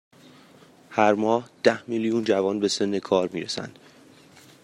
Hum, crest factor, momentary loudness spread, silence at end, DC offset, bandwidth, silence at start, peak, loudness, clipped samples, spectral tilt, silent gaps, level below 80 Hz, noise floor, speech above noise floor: none; 22 dB; 9 LU; 0.95 s; under 0.1%; 12 kHz; 0.9 s; -4 dBFS; -24 LUFS; under 0.1%; -4.5 dB/octave; none; -70 dBFS; -52 dBFS; 29 dB